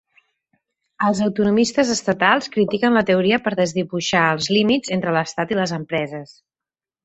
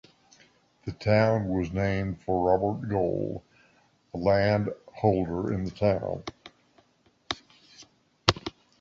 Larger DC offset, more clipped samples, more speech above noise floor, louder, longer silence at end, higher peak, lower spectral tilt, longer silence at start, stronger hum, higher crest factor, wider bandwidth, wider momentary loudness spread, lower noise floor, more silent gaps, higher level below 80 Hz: neither; neither; first, 71 dB vs 40 dB; first, -19 LUFS vs -27 LUFS; first, 0.8 s vs 0.3 s; about the same, -2 dBFS vs -2 dBFS; second, -4.5 dB/octave vs -6.5 dB/octave; first, 1 s vs 0.85 s; neither; second, 18 dB vs 26 dB; about the same, 8.2 kHz vs 8 kHz; second, 6 LU vs 14 LU; first, -90 dBFS vs -66 dBFS; neither; second, -58 dBFS vs -48 dBFS